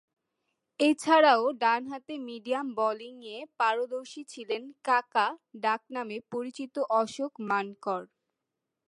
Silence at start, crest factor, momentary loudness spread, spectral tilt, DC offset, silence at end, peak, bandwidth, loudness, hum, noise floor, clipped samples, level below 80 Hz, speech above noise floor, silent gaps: 0.8 s; 20 dB; 16 LU; -3.5 dB/octave; under 0.1%; 0.8 s; -10 dBFS; 11.5 kHz; -29 LUFS; none; -86 dBFS; under 0.1%; -84 dBFS; 57 dB; none